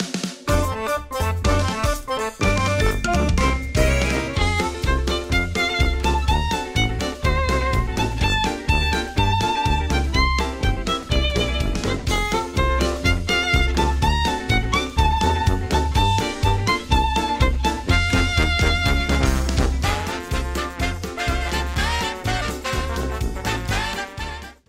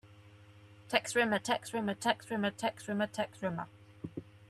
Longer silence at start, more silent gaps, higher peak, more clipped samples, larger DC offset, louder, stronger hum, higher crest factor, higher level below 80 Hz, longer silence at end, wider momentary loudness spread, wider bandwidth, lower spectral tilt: about the same, 0 s vs 0.05 s; neither; first, -4 dBFS vs -12 dBFS; neither; neither; first, -21 LUFS vs -34 LUFS; neither; second, 16 dB vs 24 dB; first, -24 dBFS vs -74 dBFS; about the same, 0.15 s vs 0.05 s; second, 6 LU vs 16 LU; first, 16 kHz vs 14 kHz; about the same, -4.5 dB/octave vs -4 dB/octave